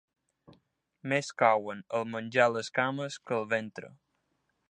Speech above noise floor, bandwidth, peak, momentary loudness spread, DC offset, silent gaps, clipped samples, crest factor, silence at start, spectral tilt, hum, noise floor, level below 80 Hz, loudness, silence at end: 48 dB; 10 kHz; -8 dBFS; 11 LU; under 0.1%; none; under 0.1%; 24 dB; 1.05 s; -4.5 dB/octave; none; -78 dBFS; -80 dBFS; -30 LUFS; 0.8 s